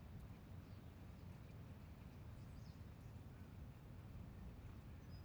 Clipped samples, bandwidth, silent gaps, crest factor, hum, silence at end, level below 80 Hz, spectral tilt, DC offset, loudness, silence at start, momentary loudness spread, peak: under 0.1%; over 20 kHz; none; 12 dB; none; 0 s; -62 dBFS; -7 dB/octave; under 0.1%; -58 LUFS; 0 s; 2 LU; -44 dBFS